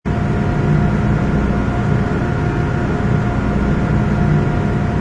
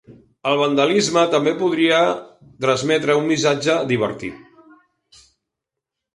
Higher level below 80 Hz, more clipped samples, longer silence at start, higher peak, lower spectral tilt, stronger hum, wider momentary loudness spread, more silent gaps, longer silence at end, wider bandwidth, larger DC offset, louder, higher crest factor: first, -24 dBFS vs -60 dBFS; neither; about the same, 0.05 s vs 0.1 s; about the same, -4 dBFS vs -2 dBFS; first, -8.5 dB/octave vs -4.5 dB/octave; neither; second, 3 LU vs 8 LU; neither; second, 0 s vs 1.8 s; second, 9.4 kHz vs 11.5 kHz; neither; about the same, -17 LUFS vs -18 LUFS; second, 12 dB vs 18 dB